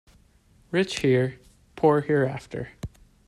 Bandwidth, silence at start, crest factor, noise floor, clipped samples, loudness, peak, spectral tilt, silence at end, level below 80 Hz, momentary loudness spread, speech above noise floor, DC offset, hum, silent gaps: 12.5 kHz; 0.7 s; 18 dB; -59 dBFS; under 0.1%; -24 LUFS; -8 dBFS; -6.5 dB/octave; 0.4 s; -52 dBFS; 16 LU; 36 dB; under 0.1%; none; none